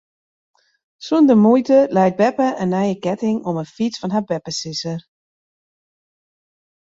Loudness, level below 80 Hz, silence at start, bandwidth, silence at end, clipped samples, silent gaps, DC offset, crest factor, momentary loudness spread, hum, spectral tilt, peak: -18 LUFS; -62 dBFS; 1 s; 7.8 kHz; 1.85 s; under 0.1%; none; under 0.1%; 16 dB; 12 LU; none; -6 dB/octave; -2 dBFS